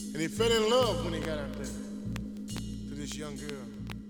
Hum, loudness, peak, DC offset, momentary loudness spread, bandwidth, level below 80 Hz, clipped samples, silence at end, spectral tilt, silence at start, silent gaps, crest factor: none; -32 LUFS; -14 dBFS; under 0.1%; 14 LU; over 20 kHz; -46 dBFS; under 0.1%; 0 s; -4.5 dB/octave; 0 s; none; 20 dB